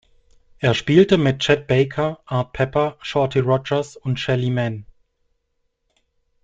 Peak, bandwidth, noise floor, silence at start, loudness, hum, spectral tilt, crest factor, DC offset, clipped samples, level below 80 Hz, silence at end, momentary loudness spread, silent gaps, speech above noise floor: -2 dBFS; 7.8 kHz; -71 dBFS; 0.6 s; -20 LUFS; none; -6.5 dB/octave; 18 dB; under 0.1%; under 0.1%; -50 dBFS; 1.6 s; 9 LU; none; 52 dB